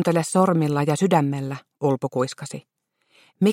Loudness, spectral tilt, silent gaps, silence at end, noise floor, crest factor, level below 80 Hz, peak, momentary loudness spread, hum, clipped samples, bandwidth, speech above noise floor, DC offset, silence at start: -22 LUFS; -6.5 dB/octave; none; 0 s; -61 dBFS; 18 dB; -66 dBFS; -6 dBFS; 14 LU; none; under 0.1%; 16 kHz; 40 dB; under 0.1%; 0 s